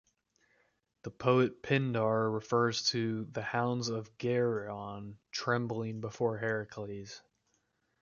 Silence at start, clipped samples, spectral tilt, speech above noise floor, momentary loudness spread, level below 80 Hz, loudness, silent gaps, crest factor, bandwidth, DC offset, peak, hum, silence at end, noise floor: 1.05 s; under 0.1%; -5.5 dB/octave; 44 dB; 14 LU; -70 dBFS; -33 LUFS; none; 22 dB; 7.2 kHz; under 0.1%; -12 dBFS; none; 0.8 s; -77 dBFS